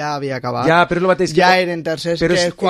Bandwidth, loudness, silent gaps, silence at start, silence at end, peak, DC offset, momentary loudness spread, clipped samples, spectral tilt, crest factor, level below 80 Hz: 13 kHz; -16 LUFS; none; 0 s; 0 s; 0 dBFS; under 0.1%; 9 LU; under 0.1%; -5 dB/octave; 16 dB; -46 dBFS